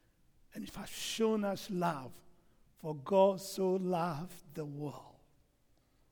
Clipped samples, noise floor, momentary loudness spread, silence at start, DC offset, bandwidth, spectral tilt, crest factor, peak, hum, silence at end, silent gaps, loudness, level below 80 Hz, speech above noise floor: under 0.1%; -71 dBFS; 18 LU; 0.55 s; under 0.1%; over 20 kHz; -5.5 dB/octave; 20 dB; -16 dBFS; none; 1 s; none; -35 LUFS; -68 dBFS; 36 dB